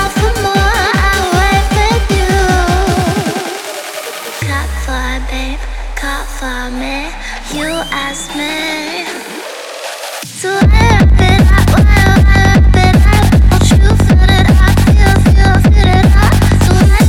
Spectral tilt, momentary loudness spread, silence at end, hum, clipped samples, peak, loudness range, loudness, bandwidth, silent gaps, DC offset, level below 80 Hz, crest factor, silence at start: -5.5 dB/octave; 13 LU; 0 s; none; under 0.1%; 0 dBFS; 11 LU; -11 LUFS; 16.5 kHz; none; under 0.1%; -14 dBFS; 10 dB; 0 s